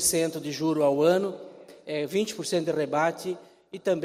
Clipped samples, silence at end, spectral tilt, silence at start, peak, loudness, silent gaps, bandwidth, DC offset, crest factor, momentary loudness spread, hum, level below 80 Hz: under 0.1%; 0 s; -4 dB/octave; 0 s; -10 dBFS; -27 LUFS; none; 16 kHz; under 0.1%; 16 dB; 18 LU; none; -66 dBFS